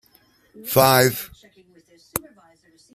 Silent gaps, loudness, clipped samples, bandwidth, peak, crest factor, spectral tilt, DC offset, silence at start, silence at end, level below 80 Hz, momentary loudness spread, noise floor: none; -19 LUFS; under 0.1%; 15.5 kHz; -2 dBFS; 22 dB; -4 dB/octave; under 0.1%; 0.6 s; 0.75 s; -56 dBFS; 21 LU; -58 dBFS